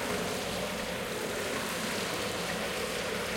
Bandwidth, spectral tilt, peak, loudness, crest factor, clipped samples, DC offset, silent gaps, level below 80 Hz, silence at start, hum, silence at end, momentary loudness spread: 17 kHz; -3 dB/octave; -20 dBFS; -33 LUFS; 14 dB; under 0.1%; under 0.1%; none; -56 dBFS; 0 s; none; 0 s; 2 LU